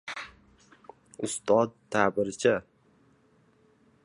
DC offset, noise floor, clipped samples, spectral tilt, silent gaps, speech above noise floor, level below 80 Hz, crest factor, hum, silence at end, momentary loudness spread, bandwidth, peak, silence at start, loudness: under 0.1%; -64 dBFS; under 0.1%; -4.5 dB/octave; none; 37 dB; -66 dBFS; 24 dB; none; 1.45 s; 15 LU; 11.5 kHz; -6 dBFS; 0.05 s; -28 LUFS